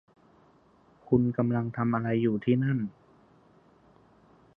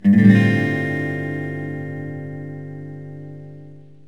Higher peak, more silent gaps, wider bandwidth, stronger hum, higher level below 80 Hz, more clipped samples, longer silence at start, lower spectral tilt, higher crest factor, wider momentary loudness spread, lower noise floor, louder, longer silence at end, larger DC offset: second, -10 dBFS vs -2 dBFS; neither; second, 3.7 kHz vs 7 kHz; second, none vs 50 Hz at -40 dBFS; about the same, -64 dBFS vs -64 dBFS; neither; first, 1.1 s vs 0.05 s; first, -11 dB/octave vs -8.5 dB/octave; about the same, 20 dB vs 18 dB; second, 4 LU vs 23 LU; first, -61 dBFS vs -42 dBFS; second, -28 LUFS vs -19 LUFS; first, 1.65 s vs 0.25 s; second, under 0.1% vs 0.5%